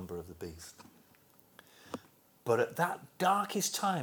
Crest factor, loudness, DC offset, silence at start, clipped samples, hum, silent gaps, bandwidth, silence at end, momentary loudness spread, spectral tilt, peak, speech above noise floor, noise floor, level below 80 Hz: 20 dB; -33 LUFS; under 0.1%; 0 s; under 0.1%; none; none; over 20 kHz; 0 s; 17 LU; -3.5 dB/octave; -16 dBFS; 31 dB; -64 dBFS; -68 dBFS